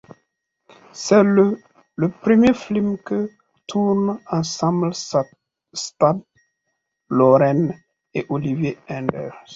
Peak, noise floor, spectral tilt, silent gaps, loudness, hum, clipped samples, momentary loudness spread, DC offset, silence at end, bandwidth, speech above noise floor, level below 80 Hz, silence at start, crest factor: -2 dBFS; -76 dBFS; -6.5 dB/octave; none; -20 LUFS; none; under 0.1%; 15 LU; under 0.1%; 0 s; 7.8 kHz; 57 dB; -56 dBFS; 0.95 s; 18 dB